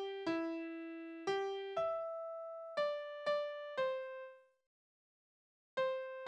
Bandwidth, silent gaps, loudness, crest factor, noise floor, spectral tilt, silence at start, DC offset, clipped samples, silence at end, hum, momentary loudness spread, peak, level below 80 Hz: 9.8 kHz; 4.66-5.77 s; -41 LUFS; 16 dB; under -90 dBFS; -4.5 dB/octave; 0 s; under 0.1%; under 0.1%; 0 s; none; 8 LU; -26 dBFS; -84 dBFS